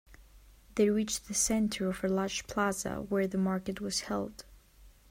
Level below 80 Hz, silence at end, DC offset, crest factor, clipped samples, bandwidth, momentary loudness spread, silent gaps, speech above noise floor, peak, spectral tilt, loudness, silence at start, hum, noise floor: -56 dBFS; 0.2 s; under 0.1%; 18 dB; under 0.1%; 16 kHz; 8 LU; none; 27 dB; -16 dBFS; -4 dB/octave; -32 LUFS; 0.1 s; none; -58 dBFS